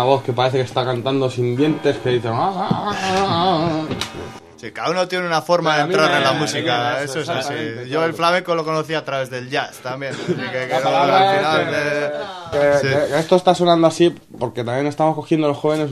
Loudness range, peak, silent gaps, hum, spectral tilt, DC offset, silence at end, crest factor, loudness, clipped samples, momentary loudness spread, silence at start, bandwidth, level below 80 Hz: 4 LU; 0 dBFS; none; none; -5 dB/octave; under 0.1%; 0 s; 18 dB; -19 LUFS; under 0.1%; 10 LU; 0 s; 14 kHz; -56 dBFS